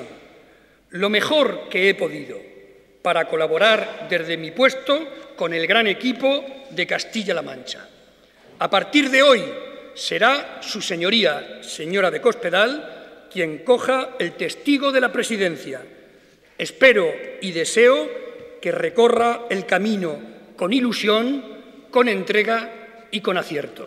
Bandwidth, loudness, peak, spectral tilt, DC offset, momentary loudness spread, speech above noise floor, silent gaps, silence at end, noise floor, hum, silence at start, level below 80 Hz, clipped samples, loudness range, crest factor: 14.5 kHz; -20 LUFS; -2 dBFS; -3.5 dB/octave; under 0.1%; 16 LU; 33 dB; none; 0 s; -53 dBFS; none; 0 s; -66 dBFS; under 0.1%; 3 LU; 20 dB